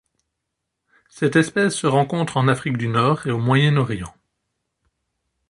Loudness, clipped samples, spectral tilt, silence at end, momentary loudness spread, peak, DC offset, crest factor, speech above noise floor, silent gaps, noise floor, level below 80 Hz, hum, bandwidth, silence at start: -19 LUFS; under 0.1%; -6 dB/octave; 1.4 s; 7 LU; -2 dBFS; under 0.1%; 18 dB; 60 dB; none; -79 dBFS; -54 dBFS; none; 11.5 kHz; 1.15 s